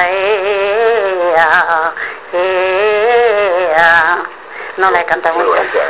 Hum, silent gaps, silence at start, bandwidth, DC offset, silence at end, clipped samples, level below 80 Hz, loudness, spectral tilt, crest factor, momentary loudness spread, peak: none; none; 0 s; 4 kHz; 0.6%; 0 s; 0.1%; -50 dBFS; -12 LUFS; -6.5 dB/octave; 12 dB; 9 LU; 0 dBFS